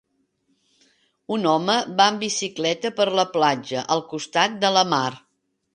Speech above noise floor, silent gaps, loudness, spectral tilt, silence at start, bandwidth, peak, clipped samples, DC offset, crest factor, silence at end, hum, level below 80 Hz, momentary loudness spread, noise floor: 47 dB; none; -21 LUFS; -3 dB/octave; 1.3 s; 9.8 kHz; -2 dBFS; under 0.1%; under 0.1%; 20 dB; 0.55 s; none; -70 dBFS; 6 LU; -69 dBFS